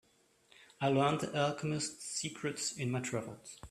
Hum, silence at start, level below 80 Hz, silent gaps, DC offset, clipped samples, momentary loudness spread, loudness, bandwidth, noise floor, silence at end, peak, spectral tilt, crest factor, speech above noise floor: none; 0.6 s; -70 dBFS; none; under 0.1%; under 0.1%; 9 LU; -35 LUFS; 14 kHz; -68 dBFS; 0 s; -16 dBFS; -4.5 dB/octave; 20 dB; 33 dB